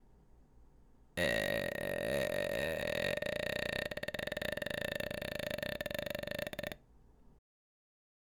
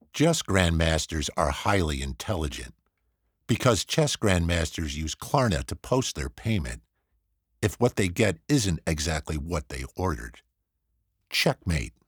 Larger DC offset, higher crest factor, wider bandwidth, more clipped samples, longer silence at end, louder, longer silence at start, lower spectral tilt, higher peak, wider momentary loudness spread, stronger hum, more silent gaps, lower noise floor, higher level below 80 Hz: neither; about the same, 20 dB vs 22 dB; about the same, over 20 kHz vs over 20 kHz; neither; first, 1.05 s vs 0.15 s; second, -37 LUFS vs -27 LUFS; about the same, 0.1 s vs 0.15 s; about the same, -4 dB/octave vs -4.5 dB/octave; second, -20 dBFS vs -4 dBFS; second, 6 LU vs 9 LU; neither; neither; second, -63 dBFS vs -77 dBFS; second, -58 dBFS vs -40 dBFS